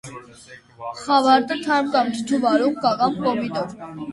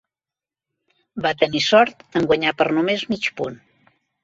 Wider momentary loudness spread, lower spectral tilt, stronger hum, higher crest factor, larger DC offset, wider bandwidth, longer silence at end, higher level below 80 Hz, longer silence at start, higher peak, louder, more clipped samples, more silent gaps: first, 17 LU vs 11 LU; about the same, -4.5 dB/octave vs -4.5 dB/octave; neither; about the same, 18 dB vs 20 dB; neither; first, 11.5 kHz vs 7.8 kHz; second, 0 s vs 0.7 s; about the same, -60 dBFS vs -58 dBFS; second, 0.05 s vs 1.15 s; about the same, -4 dBFS vs -2 dBFS; about the same, -20 LUFS vs -20 LUFS; neither; neither